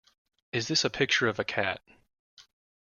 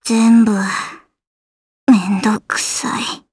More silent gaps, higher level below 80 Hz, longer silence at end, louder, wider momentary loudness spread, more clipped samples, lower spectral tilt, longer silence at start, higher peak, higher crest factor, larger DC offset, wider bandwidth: second, 2.19-2.37 s vs 1.27-1.87 s; second, -66 dBFS vs -58 dBFS; first, 0.45 s vs 0.15 s; second, -28 LUFS vs -15 LUFS; about the same, 9 LU vs 11 LU; neither; about the same, -3 dB/octave vs -4 dB/octave; first, 0.55 s vs 0.05 s; second, -12 dBFS vs 0 dBFS; about the same, 20 dB vs 16 dB; neither; about the same, 12 kHz vs 11 kHz